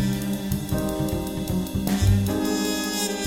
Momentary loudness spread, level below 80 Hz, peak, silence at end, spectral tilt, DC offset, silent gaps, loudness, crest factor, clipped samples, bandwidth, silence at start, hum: 6 LU; -36 dBFS; -8 dBFS; 0 s; -5 dB/octave; under 0.1%; none; -25 LUFS; 16 dB; under 0.1%; 17 kHz; 0 s; none